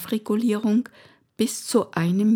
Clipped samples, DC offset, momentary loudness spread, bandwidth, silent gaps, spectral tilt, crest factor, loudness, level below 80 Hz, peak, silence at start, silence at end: under 0.1%; under 0.1%; 5 LU; 18.5 kHz; none; -5.5 dB/octave; 18 dB; -23 LUFS; -74 dBFS; -6 dBFS; 0 s; 0 s